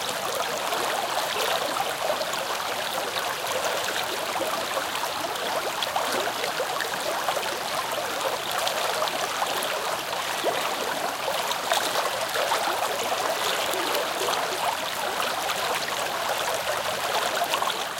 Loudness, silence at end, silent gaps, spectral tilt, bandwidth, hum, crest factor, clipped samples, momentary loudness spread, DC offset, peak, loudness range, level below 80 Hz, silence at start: -26 LUFS; 0 s; none; -1 dB/octave; 17 kHz; none; 22 dB; under 0.1%; 3 LU; under 0.1%; -6 dBFS; 2 LU; -64 dBFS; 0 s